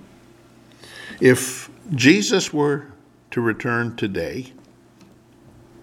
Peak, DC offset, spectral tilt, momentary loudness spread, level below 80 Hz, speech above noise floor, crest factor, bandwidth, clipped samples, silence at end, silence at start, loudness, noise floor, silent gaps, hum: -2 dBFS; under 0.1%; -4.5 dB/octave; 20 LU; -58 dBFS; 31 dB; 22 dB; 17 kHz; under 0.1%; 1.35 s; 0.85 s; -20 LUFS; -50 dBFS; none; none